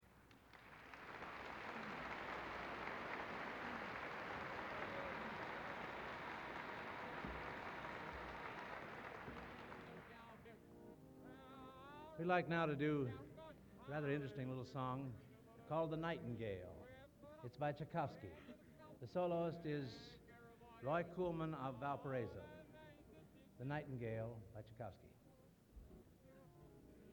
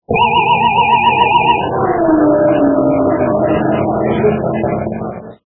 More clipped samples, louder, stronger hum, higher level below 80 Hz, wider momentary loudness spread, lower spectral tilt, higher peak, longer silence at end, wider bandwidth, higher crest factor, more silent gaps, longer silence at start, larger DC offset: neither; second, -47 LUFS vs -12 LUFS; neither; second, -70 dBFS vs -40 dBFS; first, 20 LU vs 7 LU; second, -7 dB/octave vs -10.5 dB/octave; second, -24 dBFS vs 0 dBFS; about the same, 0 s vs 0.1 s; first, 19.5 kHz vs 3.6 kHz; first, 24 dB vs 12 dB; neither; about the same, 0 s vs 0.1 s; neither